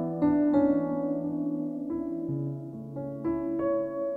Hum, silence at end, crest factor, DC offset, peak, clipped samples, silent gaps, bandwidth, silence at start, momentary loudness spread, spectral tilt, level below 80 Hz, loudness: none; 0 s; 14 dB; under 0.1%; -14 dBFS; under 0.1%; none; 3.9 kHz; 0 s; 12 LU; -11.5 dB/octave; -58 dBFS; -29 LUFS